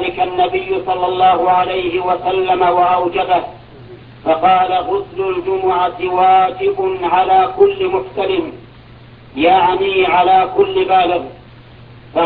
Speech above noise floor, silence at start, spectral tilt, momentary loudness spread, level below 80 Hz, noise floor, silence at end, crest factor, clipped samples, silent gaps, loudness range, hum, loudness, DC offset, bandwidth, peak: 25 dB; 0 s; -8.5 dB/octave; 8 LU; -46 dBFS; -39 dBFS; 0 s; 14 dB; under 0.1%; none; 1 LU; none; -14 LUFS; under 0.1%; 4.8 kHz; 0 dBFS